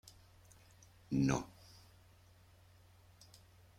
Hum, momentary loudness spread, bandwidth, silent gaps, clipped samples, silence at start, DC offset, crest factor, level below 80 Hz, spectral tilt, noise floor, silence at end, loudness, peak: none; 28 LU; 16 kHz; none; under 0.1%; 1.1 s; under 0.1%; 24 dB; -64 dBFS; -6 dB/octave; -64 dBFS; 2.3 s; -37 LUFS; -20 dBFS